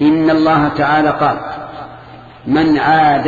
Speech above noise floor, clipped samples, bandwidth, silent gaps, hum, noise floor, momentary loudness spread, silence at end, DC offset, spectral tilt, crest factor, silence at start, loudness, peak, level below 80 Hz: 24 dB; under 0.1%; 7.2 kHz; none; none; -36 dBFS; 19 LU; 0 s; under 0.1%; -8 dB/octave; 12 dB; 0 s; -13 LUFS; -2 dBFS; -44 dBFS